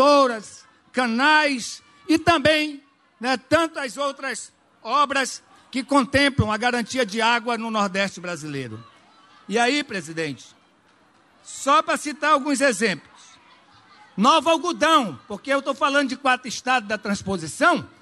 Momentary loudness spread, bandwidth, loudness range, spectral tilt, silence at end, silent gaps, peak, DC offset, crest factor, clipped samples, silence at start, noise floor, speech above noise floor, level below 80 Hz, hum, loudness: 15 LU; 13 kHz; 4 LU; -3.5 dB/octave; 0.15 s; none; -6 dBFS; under 0.1%; 18 dB; under 0.1%; 0 s; -58 dBFS; 37 dB; -54 dBFS; none; -21 LUFS